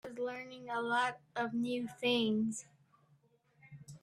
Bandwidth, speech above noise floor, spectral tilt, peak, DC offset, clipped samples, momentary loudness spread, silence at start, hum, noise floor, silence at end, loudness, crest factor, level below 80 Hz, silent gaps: 13 kHz; 35 dB; -4 dB/octave; -20 dBFS; under 0.1%; under 0.1%; 14 LU; 0.05 s; none; -71 dBFS; 0.05 s; -36 LUFS; 18 dB; -78 dBFS; none